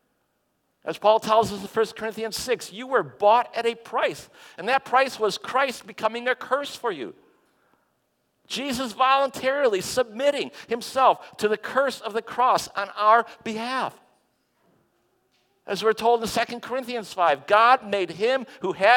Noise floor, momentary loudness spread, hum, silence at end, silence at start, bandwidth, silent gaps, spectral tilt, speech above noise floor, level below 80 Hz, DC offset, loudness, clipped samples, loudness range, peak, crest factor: -72 dBFS; 11 LU; none; 0 s; 0.85 s; 17.5 kHz; none; -3 dB/octave; 49 dB; -64 dBFS; under 0.1%; -24 LUFS; under 0.1%; 5 LU; -4 dBFS; 20 dB